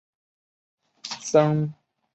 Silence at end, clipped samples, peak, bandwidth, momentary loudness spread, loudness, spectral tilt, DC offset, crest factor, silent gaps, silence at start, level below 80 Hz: 0.4 s; under 0.1%; -4 dBFS; 8.4 kHz; 16 LU; -23 LUFS; -6 dB/octave; under 0.1%; 22 dB; none; 1.05 s; -68 dBFS